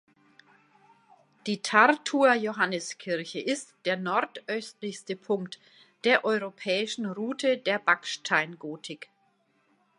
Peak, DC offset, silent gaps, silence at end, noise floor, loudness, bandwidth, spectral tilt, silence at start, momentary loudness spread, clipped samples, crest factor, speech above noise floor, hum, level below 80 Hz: -4 dBFS; under 0.1%; none; 0.95 s; -69 dBFS; -27 LUFS; 11 kHz; -3.5 dB/octave; 1.45 s; 15 LU; under 0.1%; 24 dB; 42 dB; none; -84 dBFS